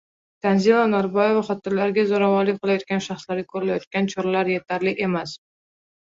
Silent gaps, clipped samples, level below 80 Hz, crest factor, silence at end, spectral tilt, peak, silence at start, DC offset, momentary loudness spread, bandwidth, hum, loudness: 3.87-3.91 s; under 0.1%; -64 dBFS; 16 dB; 0.65 s; -6.5 dB/octave; -4 dBFS; 0.45 s; under 0.1%; 10 LU; 7.8 kHz; none; -22 LUFS